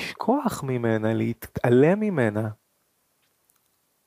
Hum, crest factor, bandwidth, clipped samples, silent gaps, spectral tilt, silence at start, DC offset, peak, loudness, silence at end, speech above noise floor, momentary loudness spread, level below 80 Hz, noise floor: none; 18 dB; 15.5 kHz; under 0.1%; none; -7 dB/octave; 0 s; under 0.1%; -6 dBFS; -24 LUFS; 1.55 s; 47 dB; 10 LU; -58 dBFS; -70 dBFS